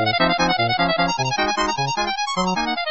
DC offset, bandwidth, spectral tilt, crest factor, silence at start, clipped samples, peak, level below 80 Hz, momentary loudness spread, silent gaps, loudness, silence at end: 0.6%; 8.2 kHz; -3.5 dB/octave; 14 dB; 0 s; under 0.1%; -6 dBFS; -44 dBFS; 4 LU; none; -20 LUFS; 0 s